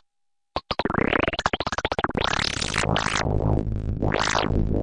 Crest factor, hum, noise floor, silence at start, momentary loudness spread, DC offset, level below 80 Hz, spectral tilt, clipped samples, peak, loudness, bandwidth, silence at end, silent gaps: 18 dB; none; -75 dBFS; 0.55 s; 5 LU; under 0.1%; -34 dBFS; -4.5 dB/octave; under 0.1%; -6 dBFS; -24 LUFS; 11.5 kHz; 0 s; none